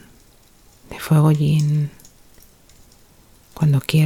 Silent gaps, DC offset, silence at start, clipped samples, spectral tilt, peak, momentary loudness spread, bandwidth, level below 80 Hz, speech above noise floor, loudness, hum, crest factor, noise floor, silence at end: none; under 0.1%; 0.9 s; under 0.1%; -7 dB/octave; -2 dBFS; 15 LU; 15.5 kHz; -50 dBFS; 35 dB; -18 LUFS; none; 18 dB; -51 dBFS; 0 s